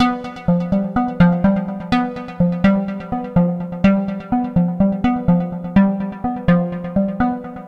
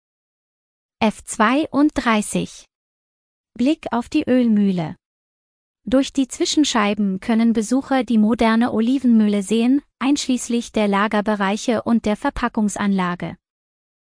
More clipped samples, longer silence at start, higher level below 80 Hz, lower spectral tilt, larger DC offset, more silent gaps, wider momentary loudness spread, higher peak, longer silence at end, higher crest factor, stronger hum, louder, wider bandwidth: neither; second, 0 s vs 1 s; first, -38 dBFS vs -48 dBFS; first, -9.5 dB/octave vs -5 dB/octave; neither; second, none vs 2.75-3.44 s, 5.06-5.75 s; about the same, 6 LU vs 6 LU; about the same, -2 dBFS vs -4 dBFS; second, 0 s vs 0.85 s; about the same, 16 dB vs 16 dB; neither; about the same, -18 LUFS vs -19 LUFS; second, 5.6 kHz vs 10.5 kHz